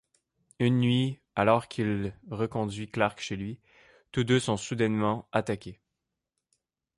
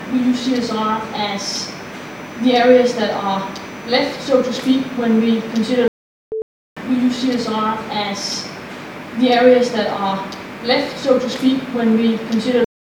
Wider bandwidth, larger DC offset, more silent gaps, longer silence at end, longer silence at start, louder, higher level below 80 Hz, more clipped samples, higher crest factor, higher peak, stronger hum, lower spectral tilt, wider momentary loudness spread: second, 11.5 kHz vs 17 kHz; neither; second, none vs 5.88-6.31 s, 6.42-6.76 s; first, 1.25 s vs 0.2 s; first, 0.6 s vs 0 s; second, -29 LUFS vs -17 LUFS; about the same, -58 dBFS vs -56 dBFS; neither; about the same, 20 dB vs 18 dB; second, -8 dBFS vs 0 dBFS; neither; first, -6 dB/octave vs -4.5 dB/octave; second, 11 LU vs 16 LU